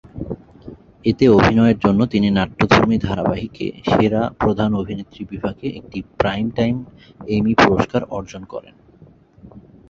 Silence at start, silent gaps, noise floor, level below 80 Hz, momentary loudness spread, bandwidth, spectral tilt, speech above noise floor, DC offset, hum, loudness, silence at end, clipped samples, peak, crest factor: 0.15 s; none; -48 dBFS; -40 dBFS; 17 LU; 7.4 kHz; -7 dB/octave; 30 dB; under 0.1%; none; -18 LUFS; 0.3 s; under 0.1%; 0 dBFS; 18 dB